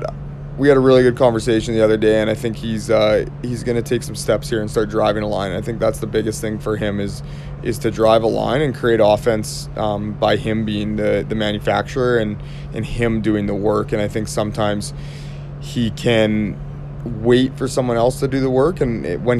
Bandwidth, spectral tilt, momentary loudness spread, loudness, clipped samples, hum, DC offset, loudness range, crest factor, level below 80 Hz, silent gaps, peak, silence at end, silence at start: 14 kHz; -6 dB/octave; 12 LU; -18 LUFS; under 0.1%; none; under 0.1%; 5 LU; 18 dB; -36 dBFS; none; 0 dBFS; 0 s; 0 s